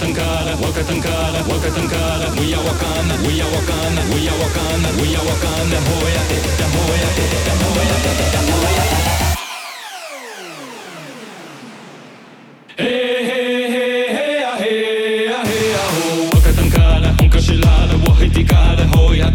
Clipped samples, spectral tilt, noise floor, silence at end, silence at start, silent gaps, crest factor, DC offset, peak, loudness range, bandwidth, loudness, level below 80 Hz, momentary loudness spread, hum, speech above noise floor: under 0.1%; -5 dB/octave; -41 dBFS; 0 s; 0 s; none; 14 dB; under 0.1%; 0 dBFS; 9 LU; 19 kHz; -16 LUFS; -20 dBFS; 17 LU; none; 25 dB